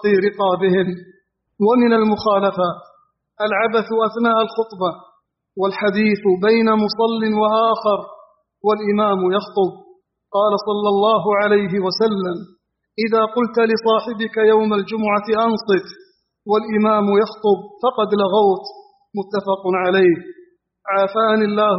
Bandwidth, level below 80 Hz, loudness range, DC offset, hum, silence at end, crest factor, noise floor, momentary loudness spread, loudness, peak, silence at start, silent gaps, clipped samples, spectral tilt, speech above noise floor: 6 kHz; -62 dBFS; 2 LU; under 0.1%; none; 0 s; 14 dB; -56 dBFS; 9 LU; -18 LUFS; -4 dBFS; 0 s; none; under 0.1%; -4 dB/octave; 40 dB